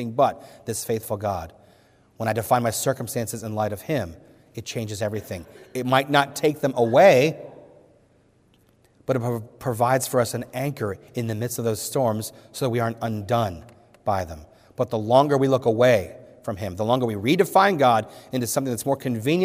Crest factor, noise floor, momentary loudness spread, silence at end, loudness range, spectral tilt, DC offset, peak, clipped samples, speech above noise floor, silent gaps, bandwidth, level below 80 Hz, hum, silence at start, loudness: 20 dB; -59 dBFS; 16 LU; 0 s; 6 LU; -5 dB/octave; under 0.1%; -4 dBFS; under 0.1%; 37 dB; none; 16 kHz; -60 dBFS; none; 0 s; -23 LUFS